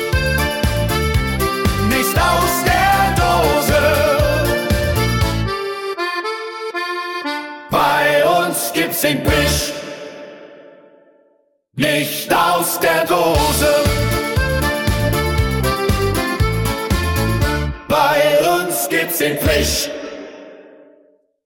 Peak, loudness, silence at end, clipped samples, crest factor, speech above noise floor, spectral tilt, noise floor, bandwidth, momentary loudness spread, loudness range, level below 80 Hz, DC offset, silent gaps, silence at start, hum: -2 dBFS; -16 LUFS; 0.75 s; under 0.1%; 16 dB; 42 dB; -4.5 dB/octave; -59 dBFS; 19 kHz; 10 LU; 5 LU; -28 dBFS; under 0.1%; none; 0 s; none